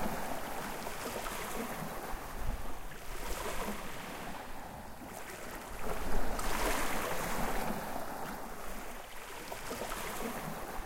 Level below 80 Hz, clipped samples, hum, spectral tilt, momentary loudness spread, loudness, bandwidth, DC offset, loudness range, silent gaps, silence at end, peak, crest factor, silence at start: -44 dBFS; under 0.1%; none; -3.5 dB/octave; 10 LU; -40 LUFS; 16.5 kHz; under 0.1%; 5 LU; none; 0 s; -16 dBFS; 18 dB; 0 s